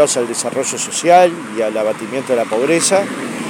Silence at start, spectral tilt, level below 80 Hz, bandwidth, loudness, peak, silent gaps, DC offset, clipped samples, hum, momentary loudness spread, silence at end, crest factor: 0 s; -3 dB/octave; -68 dBFS; 17 kHz; -15 LUFS; 0 dBFS; none; under 0.1%; under 0.1%; none; 9 LU; 0 s; 14 dB